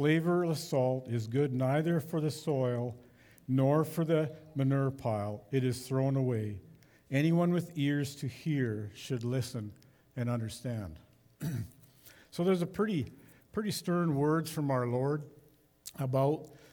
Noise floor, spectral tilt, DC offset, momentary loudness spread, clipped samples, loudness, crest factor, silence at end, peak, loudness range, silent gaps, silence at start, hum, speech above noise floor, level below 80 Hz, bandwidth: -63 dBFS; -7 dB/octave; under 0.1%; 12 LU; under 0.1%; -33 LUFS; 16 dB; 0.15 s; -16 dBFS; 5 LU; none; 0 s; none; 31 dB; -68 dBFS; over 20 kHz